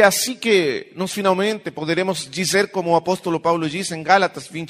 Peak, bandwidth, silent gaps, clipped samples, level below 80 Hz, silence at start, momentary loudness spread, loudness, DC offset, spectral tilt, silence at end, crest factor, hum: 0 dBFS; 15.5 kHz; none; under 0.1%; -64 dBFS; 0 s; 7 LU; -20 LUFS; under 0.1%; -3.5 dB/octave; 0 s; 20 dB; none